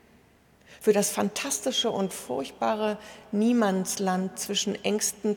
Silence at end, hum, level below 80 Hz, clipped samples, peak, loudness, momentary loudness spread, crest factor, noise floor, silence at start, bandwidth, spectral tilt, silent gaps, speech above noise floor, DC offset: 0 s; none; -66 dBFS; under 0.1%; -10 dBFS; -27 LUFS; 7 LU; 18 dB; -59 dBFS; 0.7 s; 19 kHz; -3.5 dB/octave; none; 32 dB; under 0.1%